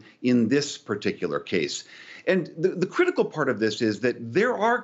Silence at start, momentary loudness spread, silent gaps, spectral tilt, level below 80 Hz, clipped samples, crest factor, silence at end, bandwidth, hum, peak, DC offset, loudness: 0.2 s; 8 LU; none; -5 dB/octave; -72 dBFS; under 0.1%; 16 dB; 0 s; 8.2 kHz; none; -8 dBFS; under 0.1%; -25 LUFS